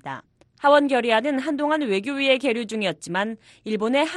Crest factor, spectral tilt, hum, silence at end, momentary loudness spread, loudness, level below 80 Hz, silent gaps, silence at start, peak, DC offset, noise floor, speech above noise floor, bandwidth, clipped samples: 18 dB; -4.5 dB/octave; none; 0 s; 12 LU; -22 LUFS; -68 dBFS; none; 0.05 s; -4 dBFS; under 0.1%; -44 dBFS; 22 dB; 11.5 kHz; under 0.1%